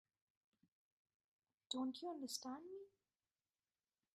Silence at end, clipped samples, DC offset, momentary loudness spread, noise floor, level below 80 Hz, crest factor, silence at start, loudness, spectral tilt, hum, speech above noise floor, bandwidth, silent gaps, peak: 1.25 s; under 0.1%; under 0.1%; 13 LU; under -90 dBFS; under -90 dBFS; 24 dB; 1.7 s; -48 LUFS; -2 dB/octave; none; over 42 dB; 12 kHz; none; -30 dBFS